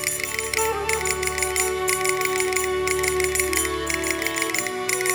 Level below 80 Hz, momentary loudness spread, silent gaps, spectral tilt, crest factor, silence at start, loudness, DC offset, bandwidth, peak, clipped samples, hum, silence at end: -42 dBFS; 3 LU; none; -2 dB/octave; 18 dB; 0 s; -22 LUFS; under 0.1%; over 20 kHz; -6 dBFS; under 0.1%; none; 0 s